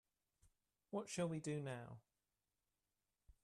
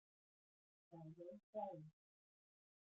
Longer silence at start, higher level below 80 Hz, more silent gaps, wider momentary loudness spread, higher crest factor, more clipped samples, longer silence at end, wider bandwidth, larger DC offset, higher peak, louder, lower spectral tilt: about the same, 0.9 s vs 0.9 s; first, -80 dBFS vs under -90 dBFS; second, none vs 1.43-1.53 s; about the same, 14 LU vs 14 LU; about the same, 20 dB vs 20 dB; neither; first, 1.45 s vs 1 s; first, 13 kHz vs 7 kHz; neither; first, -32 dBFS vs -38 dBFS; first, -47 LUFS vs -55 LUFS; second, -5.5 dB/octave vs -9 dB/octave